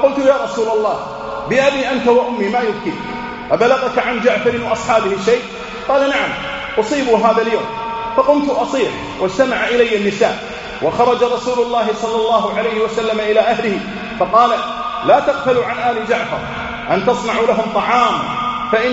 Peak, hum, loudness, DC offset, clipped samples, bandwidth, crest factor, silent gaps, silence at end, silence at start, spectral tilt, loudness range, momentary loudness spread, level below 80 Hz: 0 dBFS; none; -16 LUFS; under 0.1%; under 0.1%; 8 kHz; 16 dB; none; 0 s; 0 s; -2.5 dB/octave; 1 LU; 9 LU; -44 dBFS